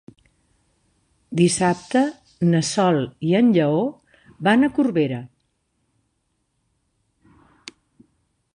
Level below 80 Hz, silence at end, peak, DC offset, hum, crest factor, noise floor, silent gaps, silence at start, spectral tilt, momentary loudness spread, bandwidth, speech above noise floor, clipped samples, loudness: -60 dBFS; 3.3 s; -4 dBFS; under 0.1%; none; 20 dB; -71 dBFS; none; 1.3 s; -5.5 dB/octave; 15 LU; 11.5 kHz; 53 dB; under 0.1%; -20 LUFS